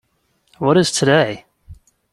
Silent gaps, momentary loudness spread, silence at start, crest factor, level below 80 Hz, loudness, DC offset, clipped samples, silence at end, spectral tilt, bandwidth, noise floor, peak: none; 8 LU; 0.6 s; 18 dB; -52 dBFS; -16 LUFS; under 0.1%; under 0.1%; 0.4 s; -4.5 dB/octave; 13 kHz; -64 dBFS; -2 dBFS